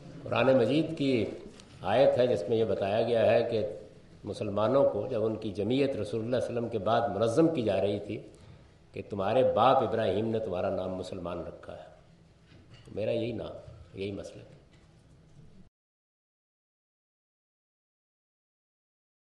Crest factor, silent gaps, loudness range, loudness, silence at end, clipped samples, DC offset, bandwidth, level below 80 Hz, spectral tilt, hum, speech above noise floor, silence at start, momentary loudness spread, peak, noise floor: 22 dB; none; 11 LU; -29 LUFS; 3.75 s; under 0.1%; under 0.1%; 11.5 kHz; -62 dBFS; -7 dB/octave; none; 30 dB; 0 s; 18 LU; -10 dBFS; -58 dBFS